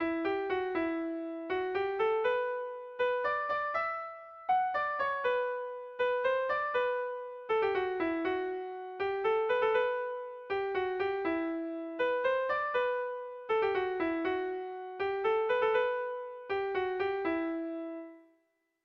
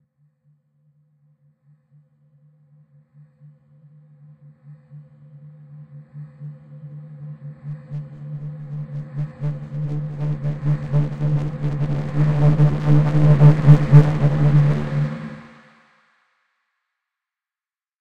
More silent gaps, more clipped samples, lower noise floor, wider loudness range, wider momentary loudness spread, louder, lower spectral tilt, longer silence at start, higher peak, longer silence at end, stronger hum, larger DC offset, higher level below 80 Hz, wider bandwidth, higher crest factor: neither; neither; second, -76 dBFS vs under -90 dBFS; second, 1 LU vs 22 LU; second, 9 LU vs 26 LU; second, -33 LUFS vs -18 LUFS; second, -6 dB/octave vs -10 dB/octave; about the same, 0 s vs 0 s; second, -18 dBFS vs 0 dBFS; first, 0.65 s vs 0 s; neither; neither; second, -68 dBFS vs -44 dBFS; first, 6 kHz vs 4.8 kHz; second, 14 dB vs 20 dB